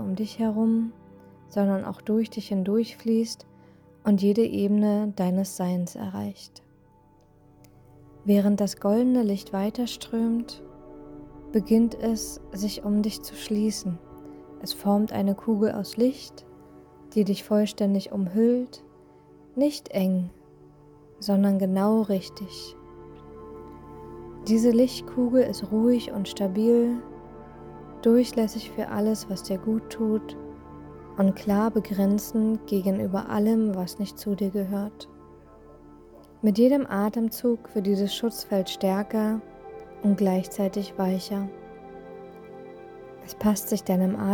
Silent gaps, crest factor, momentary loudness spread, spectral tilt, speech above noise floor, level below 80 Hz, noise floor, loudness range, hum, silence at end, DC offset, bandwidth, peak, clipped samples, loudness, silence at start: none; 16 dB; 22 LU; -6.5 dB/octave; 33 dB; -56 dBFS; -57 dBFS; 4 LU; none; 0 s; under 0.1%; 19.5 kHz; -10 dBFS; under 0.1%; -25 LUFS; 0 s